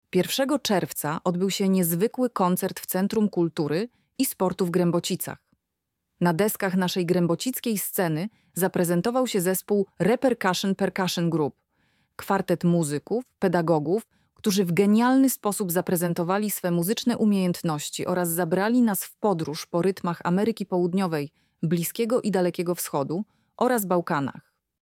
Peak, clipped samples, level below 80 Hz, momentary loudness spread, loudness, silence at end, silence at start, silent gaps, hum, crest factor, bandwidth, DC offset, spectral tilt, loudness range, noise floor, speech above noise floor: -8 dBFS; under 0.1%; -66 dBFS; 6 LU; -25 LUFS; 0.45 s; 0.15 s; none; none; 18 dB; 17.5 kHz; under 0.1%; -5.5 dB/octave; 3 LU; -82 dBFS; 58 dB